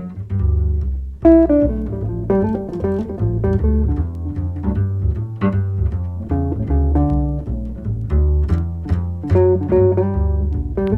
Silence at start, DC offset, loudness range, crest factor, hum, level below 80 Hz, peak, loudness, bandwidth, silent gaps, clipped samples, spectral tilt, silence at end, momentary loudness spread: 0 s; under 0.1%; 3 LU; 16 dB; none; -22 dBFS; 0 dBFS; -19 LUFS; 3.2 kHz; none; under 0.1%; -11.5 dB/octave; 0 s; 9 LU